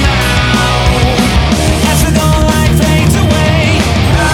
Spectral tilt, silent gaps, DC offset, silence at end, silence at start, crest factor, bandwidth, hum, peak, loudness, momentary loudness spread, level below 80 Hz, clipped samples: -5 dB/octave; none; under 0.1%; 0 s; 0 s; 8 dB; 17.5 kHz; none; 0 dBFS; -10 LUFS; 1 LU; -16 dBFS; under 0.1%